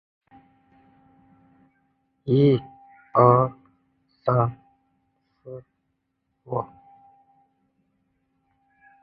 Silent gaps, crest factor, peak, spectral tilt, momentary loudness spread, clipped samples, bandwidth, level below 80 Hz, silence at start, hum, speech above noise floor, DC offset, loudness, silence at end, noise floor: none; 26 dB; -2 dBFS; -11.5 dB/octave; 25 LU; under 0.1%; 4.8 kHz; -60 dBFS; 2.25 s; none; 57 dB; under 0.1%; -22 LUFS; 2.35 s; -76 dBFS